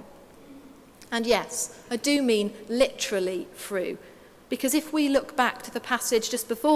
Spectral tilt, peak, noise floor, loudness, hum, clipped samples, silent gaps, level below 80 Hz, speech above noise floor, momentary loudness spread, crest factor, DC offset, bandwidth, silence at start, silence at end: -2.5 dB/octave; -6 dBFS; -50 dBFS; -26 LUFS; none; under 0.1%; none; -60 dBFS; 24 dB; 9 LU; 20 dB; under 0.1%; 16 kHz; 0 s; 0 s